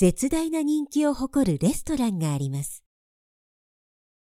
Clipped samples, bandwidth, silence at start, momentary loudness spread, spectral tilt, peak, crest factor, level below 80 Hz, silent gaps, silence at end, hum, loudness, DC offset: under 0.1%; 16 kHz; 0 s; 8 LU; -6 dB/octave; -8 dBFS; 18 dB; -46 dBFS; none; 1.5 s; none; -25 LUFS; under 0.1%